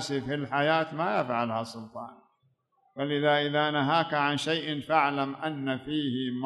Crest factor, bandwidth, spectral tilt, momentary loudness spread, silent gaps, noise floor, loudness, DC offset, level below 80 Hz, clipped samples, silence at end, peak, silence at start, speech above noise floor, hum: 20 dB; 12 kHz; -5.5 dB/octave; 12 LU; none; -71 dBFS; -28 LUFS; under 0.1%; -70 dBFS; under 0.1%; 0 s; -10 dBFS; 0 s; 43 dB; none